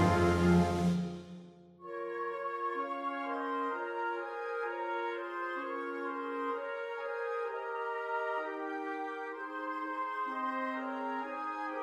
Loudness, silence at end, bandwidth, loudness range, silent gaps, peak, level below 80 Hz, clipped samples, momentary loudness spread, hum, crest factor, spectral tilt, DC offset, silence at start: -35 LUFS; 0 s; 12.5 kHz; 3 LU; none; -16 dBFS; -58 dBFS; under 0.1%; 10 LU; none; 20 dB; -7 dB/octave; under 0.1%; 0 s